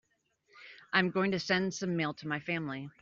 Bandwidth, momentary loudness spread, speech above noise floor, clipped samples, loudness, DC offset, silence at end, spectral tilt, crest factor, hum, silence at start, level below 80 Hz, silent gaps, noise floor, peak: 7.6 kHz; 10 LU; 41 dB; under 0.1%; -32 LUFS; under 0.1%; 0.1 s; -3.5 dB/octave; 20 dB; none; 0.55 s; -72 dBFS; none; -74 dBFS; -14 dBFS